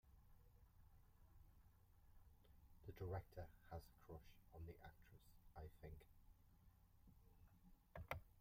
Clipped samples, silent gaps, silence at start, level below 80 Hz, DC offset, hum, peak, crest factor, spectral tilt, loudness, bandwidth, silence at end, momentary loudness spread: under 0.1%; none; 0.05 s; -68 dBFS; under 0.1%; none; -32 dBFS; 30 dB; -6.5 dB/octave; -59 LUFS; 16 kHz; 0 s; 13 LU